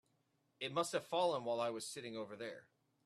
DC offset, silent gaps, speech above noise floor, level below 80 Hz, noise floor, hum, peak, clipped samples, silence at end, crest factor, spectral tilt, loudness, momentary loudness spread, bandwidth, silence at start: under 0.1%; none; 40 dB; -86 dBFS; -80 dBFS; none; -22 dBFS; under 0.1%; 0.45 s; 20 dB; -3.5 dB/octave; -41 LUFS; 12 LU; 13.5 kHz; 0.6 s